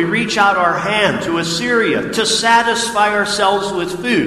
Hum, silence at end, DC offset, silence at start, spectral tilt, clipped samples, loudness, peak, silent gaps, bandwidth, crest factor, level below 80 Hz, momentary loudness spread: none; 0 s; under 0.1%; 0 s; -3 dB/octave; under 0.1%; -15 LUFS; 0 dBFS; none; 15 kHz; 16 dB; -48 dBFS; 6 LU